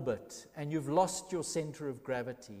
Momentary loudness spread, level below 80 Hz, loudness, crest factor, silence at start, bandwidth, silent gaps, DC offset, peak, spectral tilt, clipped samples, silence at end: 12 LU; -68 dBFS; -36 LUFS; 20 dB; 0 s; 15.5 kHz; none; under 0.1%; -16 dBFS; -5 dB/octave; under 0.1%; 0 s